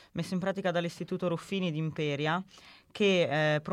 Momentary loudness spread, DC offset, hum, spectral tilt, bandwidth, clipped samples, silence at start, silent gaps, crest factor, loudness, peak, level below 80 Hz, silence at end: 9 LU; under 0.1%; none; -6 dB/octave; 13 kHz; under 0.1%; 0.15 s; none; 16 dB; -31 LUFS; -16 dBFS; -70 dBFS; 0 s